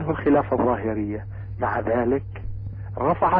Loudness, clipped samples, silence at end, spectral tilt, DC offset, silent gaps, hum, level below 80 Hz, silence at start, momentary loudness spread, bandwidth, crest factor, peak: -24 LUFS; under 0.1%; 0 s; -12 dB/octave; under 0.1%; none; none; -40 dBFS; 0 s; 14 LU; 4.7 kHz; 14 dB; -10 dBFS